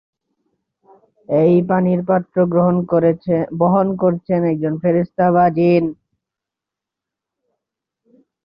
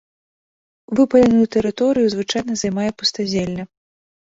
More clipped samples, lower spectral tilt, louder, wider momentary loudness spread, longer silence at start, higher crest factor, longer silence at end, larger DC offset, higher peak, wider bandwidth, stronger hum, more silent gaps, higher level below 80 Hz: neither; first, -12 dB/octave vs -5 dB/octave; about the same, -16 LUFS vs -18 LUFS; second, 5 LU vs 10 LU; first, 1.3 s vs 0.9 s; about the same, 14 dB vs 16 dB; first, 2.5 s vs 0.7 s; neither; about the same, -2 dBFS vs -2 dBFS; second, 5.4 kHz vs 8 kHz; neither; neither; second, -56 dBFS vs -50 dBFS